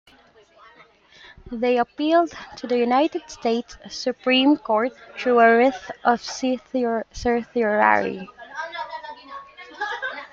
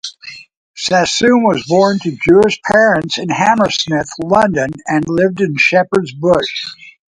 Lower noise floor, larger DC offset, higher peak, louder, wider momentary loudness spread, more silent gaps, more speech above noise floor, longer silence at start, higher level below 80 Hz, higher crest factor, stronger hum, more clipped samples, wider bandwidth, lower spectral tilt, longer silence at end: first, -54 dBFS vs -35 dBFS; neither; about the same, -2 dBFS vs 0 dBFS; second, -22 LUFS vs -13 LUFS; first, 18 LU vs 9 LU; second, none vs 0.57-0.74 s; first, 33 dB vs 22 dB; first, 1.45 s vs 0.05 s; second, -54 dBFS vs -46 dBFS; first, 20 dB vs 14 dB; neither; neither; second, 7.6 kHz vs 11.5 kHz; about the same, -4 dB/octave vs -4.5 dB/octave; second, 0.05 s vs 0.2 s